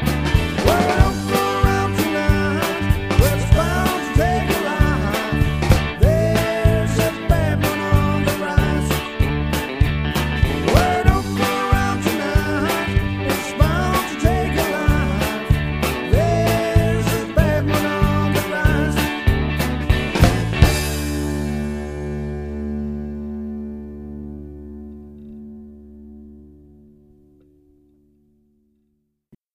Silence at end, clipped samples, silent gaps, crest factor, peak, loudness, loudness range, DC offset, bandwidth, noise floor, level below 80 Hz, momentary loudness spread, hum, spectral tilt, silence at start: 3.1 s; under 0.1%; none; 18 dB; 0 dBFS; -19 LUFS; 11 LU; under 0.1%; 15.5 kHz; -69 dBFS; -26 dBFS; 12 LU; none; -6 dB/octave; 0 s